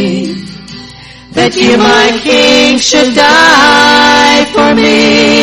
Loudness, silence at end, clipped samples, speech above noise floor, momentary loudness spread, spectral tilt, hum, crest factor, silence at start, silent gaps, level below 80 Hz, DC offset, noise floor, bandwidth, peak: -5 LUFS; 0 s; 1%; 24 dB; 15 LU; -3 dB/octave; none; 6 dB; 0 s; none; -38 dBFS; under 0.1%; -30 dBFS; 16.5 kHz; 0 dBFS